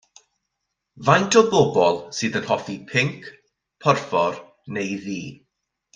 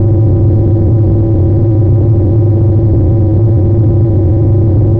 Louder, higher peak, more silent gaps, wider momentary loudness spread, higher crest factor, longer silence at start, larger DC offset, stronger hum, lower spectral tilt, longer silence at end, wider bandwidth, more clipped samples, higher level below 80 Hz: second, -21 LUFS vs -9 LUFS; about the same, -2 dBFS vs 0 dBFS; neither; first, 16 LU vs 1 LU; first, 20 dB vs 6 dB; first, 0.95 s vs 0 s; neither; neither; second, -4.5 dB/octave vs -14 dB/octave; first, 0.6 s vs 0 s; first, 9.8 kHz vs 1.7 kHz; neither; second, -62 dBFS vs -20 dBFS